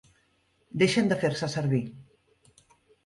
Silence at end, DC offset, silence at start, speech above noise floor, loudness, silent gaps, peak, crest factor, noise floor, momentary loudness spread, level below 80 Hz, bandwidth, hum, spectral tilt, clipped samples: 1.05 s; under 0.1%; 0.75 s; 43 dB; -27 LUFS; none; -10 dBFS; 18 dB; -69 dBFS; 12 LU; -64 dBFS; 11.5 kHz; none; -5.5 dB/octave; under 0.1%